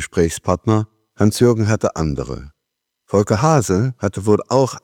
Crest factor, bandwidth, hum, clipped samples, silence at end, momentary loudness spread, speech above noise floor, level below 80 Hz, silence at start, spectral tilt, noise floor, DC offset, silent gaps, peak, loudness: 16 dB; 16.5 kHz; none; under 0.1%; 0.05 s; 8 LU; 61 dB; -40 dBFS; 0 s; -6.5 dB/octave; -78 dBFS; under 0.1%; none; 0 dBFS; -18 LUFS